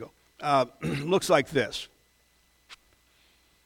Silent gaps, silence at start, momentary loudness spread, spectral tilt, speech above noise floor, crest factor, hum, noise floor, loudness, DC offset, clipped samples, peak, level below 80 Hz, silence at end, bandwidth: none; 0 s; 16 LU; -4.5 dB/octave; 39 dB; 22 dB; none; -66 dBFS; -27 LUFS; under 0.1%; under 0.1%; -6 dBFS; -60 dBFS; 0.9 s; 17.5 kHz